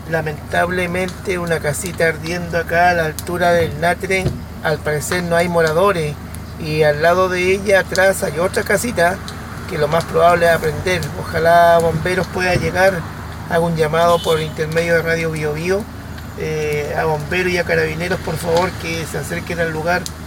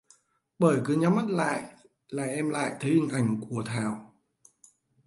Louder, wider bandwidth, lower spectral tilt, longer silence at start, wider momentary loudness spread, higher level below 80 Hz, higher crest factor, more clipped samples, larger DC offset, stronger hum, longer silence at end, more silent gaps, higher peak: first, -17 LUFS vs -28 LUFS; first, 17 kHz vs 11.5 kHz; second, -5 dB/octave vs -6.5 dB/octave; second, 0 s vs 0.6 s; about the same, 9 LU vs 10 LU; first, -36 dBFS vs -70 dBFS; about the same, 18 dB vs 20 dB; neither; neither; neither; second, 0 s vs 1 s; neither; first, 0 dBFS vs -10 dBFS